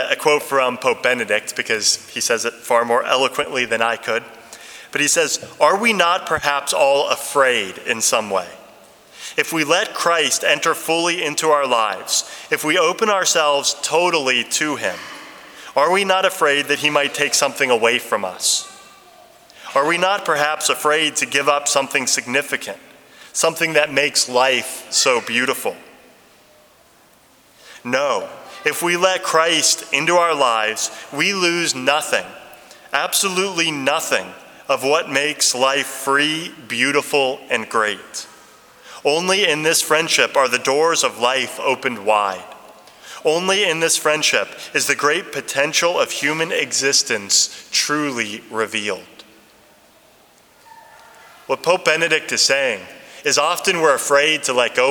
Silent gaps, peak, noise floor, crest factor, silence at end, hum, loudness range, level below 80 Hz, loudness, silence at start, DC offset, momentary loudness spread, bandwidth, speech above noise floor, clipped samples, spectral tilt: none; 0 dBFS; -52 dBFS; 20 dB; 0 s; none; 4 LU; -66 dBFS; -17 LUFS; 0 s; under 0.1%; 9 LU; over 20 kHz; 33 dB; under 0.1%; -1 dB/octave